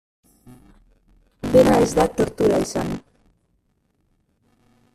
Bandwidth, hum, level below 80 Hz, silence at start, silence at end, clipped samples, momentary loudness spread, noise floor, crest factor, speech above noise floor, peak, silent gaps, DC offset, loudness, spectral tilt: 14.5 kHz; none; -44 dBFS; 1.45 s; 1.95 s; under 0.1%; 15 LU; -67 dBFS; 20 dB; 50 dB; -4 dBFS; none; under 0.1%; -19 LUFS; -6 dB/octave